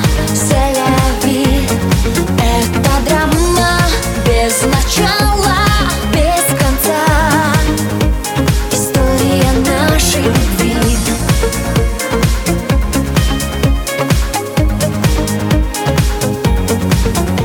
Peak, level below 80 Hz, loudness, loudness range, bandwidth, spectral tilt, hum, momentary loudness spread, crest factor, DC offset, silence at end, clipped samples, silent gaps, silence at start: 0 dBFS; -18 dBFS; -13 LUFS; 3 LU; 19 kHz; -4.5 dB/octave; none; 4 LU; 12 dB; under 0.1%; 0 s; under 0.1%; none; 0 s